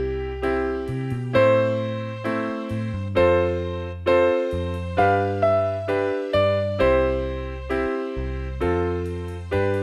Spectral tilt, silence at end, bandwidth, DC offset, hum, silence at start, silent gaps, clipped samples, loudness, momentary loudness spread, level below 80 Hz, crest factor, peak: -8 dB/octave; 0 s; 10.5 kHz; under 0.1%; none; 0 s; none; under 0.1%; -23 LUFS; 9 LU; -36 dBFS; 16 dB; -6 dBFS